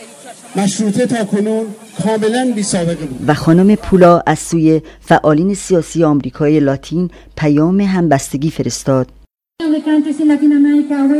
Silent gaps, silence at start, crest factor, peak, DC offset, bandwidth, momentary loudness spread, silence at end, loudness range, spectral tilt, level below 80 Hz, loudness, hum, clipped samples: none; 0 s; 14 dB; 0 dBFS; under 0.1%; 14.5 kHz; 9 LU; 0 s; 4 LU; -6.5 dB/octave; -42 dBFS; -13 LUFS; none; under 0.1%